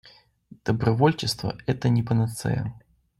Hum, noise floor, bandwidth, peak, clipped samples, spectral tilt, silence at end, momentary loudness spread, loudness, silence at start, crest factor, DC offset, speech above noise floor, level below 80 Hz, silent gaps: none; -52 dBFS; 13 kHz; -8 dBFS; under 0.1%; -6.5 dB/octave; 0.4 s; 8 LU; -25 LUFS; 0.65 s; 18 dB; under 0.1%; 29 dB; -52 dBFS; none